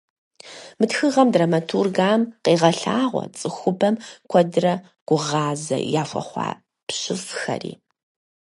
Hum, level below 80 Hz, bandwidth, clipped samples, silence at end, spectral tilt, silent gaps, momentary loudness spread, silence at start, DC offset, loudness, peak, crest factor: none; -68 dBFS; 11.5 kHz; under 0.1%; 0.65 s; -5 dB/octave; 5.01-5.06 s, 6.83-6.87 s; 12 LU; 0.45 s; under 0.1%; -21 LUFS; -2 dBFS; 20 dB